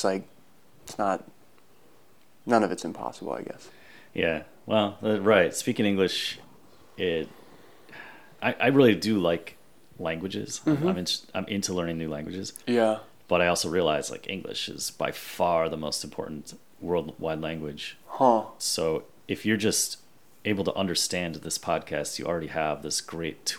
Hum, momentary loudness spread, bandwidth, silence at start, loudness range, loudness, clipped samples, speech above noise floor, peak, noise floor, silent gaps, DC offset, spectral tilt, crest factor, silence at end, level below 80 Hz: none; 14 LU; 20 kHz; 0 s; 4 LU; -27 LUFS; under 0.1%; 34 dB; -6 dBFS; -61 dBFS; none; 0.2%; -4 dB/octave; 22 dB; 0 s; -64 dBFS